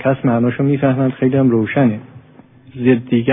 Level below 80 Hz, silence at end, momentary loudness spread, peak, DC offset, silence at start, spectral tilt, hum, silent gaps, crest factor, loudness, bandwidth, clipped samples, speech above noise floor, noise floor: -54 dBFS; 0 s; 3 LU; 0 dBFS; under 0.1%; 0 s; -13 dB/octave; none; none; 16 dB; -15 LUFS; 3.8 kHz; under 0.1%; 30 dB; -44 dBFS